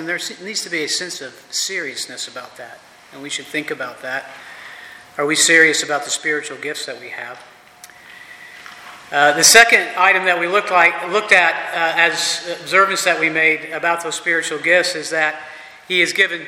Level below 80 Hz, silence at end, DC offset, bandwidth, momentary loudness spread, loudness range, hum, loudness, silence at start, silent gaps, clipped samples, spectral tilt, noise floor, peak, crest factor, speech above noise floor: -66 dBFS; 0 s; under 0.1%; 17 kHz; 24 LU; 13 LU; none; -15 LUFS; 0 s; none; under 0.1%; -0.5 dB/octave; -43 dBFS; 0 dBFS; 18 dB; 26 dB